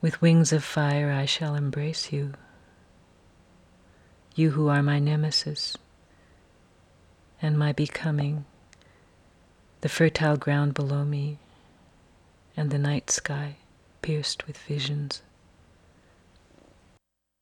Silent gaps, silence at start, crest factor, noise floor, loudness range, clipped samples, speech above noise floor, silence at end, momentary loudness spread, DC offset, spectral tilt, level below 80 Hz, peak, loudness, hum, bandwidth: none; 0 s; 20 dB; -67 dBFS; 5 LU; under 0.1%; 42 dB; 2.25 s; 13 LU; under 0.1%; -5 dB/octave; -60 dBFS; -8 dBFS; -26 LUFS; none; 11 kHz